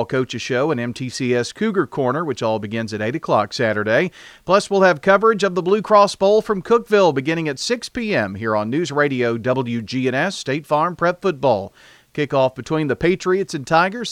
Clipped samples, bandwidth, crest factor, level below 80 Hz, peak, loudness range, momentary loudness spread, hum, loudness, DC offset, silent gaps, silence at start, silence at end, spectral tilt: under 0.1%; 14 kHz; 18 dB; -54 dBFS; 0 dBFS; 5 LU; 9 LU; none; -19 LUFS; under 0.1%; none; 0 s; 0 s; -5.5 dB/octave